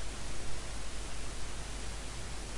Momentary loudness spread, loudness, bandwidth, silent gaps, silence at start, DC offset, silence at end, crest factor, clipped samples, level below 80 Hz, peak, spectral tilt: 0 LU; -43 LUFS; 11.5 kHz; none; 0 s; under 0.1%; 0 s; 12 dB; under 0.1%; -44 dBFS; -22 dBFS; -3 dB/octave